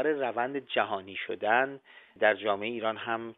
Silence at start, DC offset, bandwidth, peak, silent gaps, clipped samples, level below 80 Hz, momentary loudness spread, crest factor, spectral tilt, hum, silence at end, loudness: 0 s; under 0.1%; 4.1 kHz; -10 dBFS; none; under 0.1%; -78 dBFS; 8 LU; 20 dB; -7.5 dB/octave; none; 0.05 s; -30 LUFS